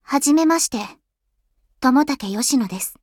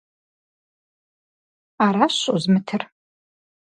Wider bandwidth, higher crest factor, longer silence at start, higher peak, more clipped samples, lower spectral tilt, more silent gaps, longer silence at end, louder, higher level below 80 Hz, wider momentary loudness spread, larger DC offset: first, 18.5 kHz vs 10 kHz; second, 16 dB vs 22 dB; second, 0.1 s vs 1.8 s; about the same, -4 dBFS vs -2 dBFS; neither; second, -3 dB/octave vs -5 dB/octave; neither; second, 0.1 s vs 0.85 s; about the same, -19 LUFS vs -20 LUFS; first, -58 dBFS vs -68 dBFS; about the same, 10 LU vs 11 LU; neither